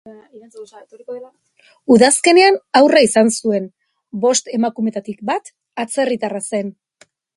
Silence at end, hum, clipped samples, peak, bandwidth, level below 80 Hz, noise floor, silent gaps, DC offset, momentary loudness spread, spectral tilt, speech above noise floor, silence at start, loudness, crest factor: 0.65 s; none; under 0.1%; 0 dBFS; 11.5 kHz; -62 dBFS; -54 dBFS; none; under 0.1%; 21 LU; -3.5 dB/octave; 38 dB; 0.05 s; -15 LUFS; 16 dB